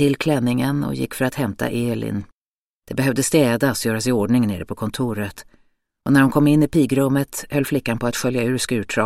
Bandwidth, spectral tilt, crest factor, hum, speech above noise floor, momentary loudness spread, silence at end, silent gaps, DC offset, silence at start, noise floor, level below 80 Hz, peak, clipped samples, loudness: 16 kHz; -5.5 dB/octave; 16 dB; none; over 71 dB; 10 LU; 0 s; 2.34-2.80 s; under 0.1%; 0 s; under -90 dBFS; -48 dBFS; -4 dBFS; under 0.1%; -20 LUFS